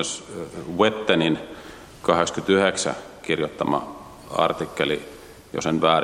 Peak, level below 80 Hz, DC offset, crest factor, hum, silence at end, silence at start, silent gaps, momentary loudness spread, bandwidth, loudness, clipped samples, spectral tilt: -2 dBFS; -56 dBFS; under 0.1%; 22 dB; none; 0 s; 0 s; none; 19 LU; 15.5 kHz; -23 LUFS; under 0.1%; -4 dB/octave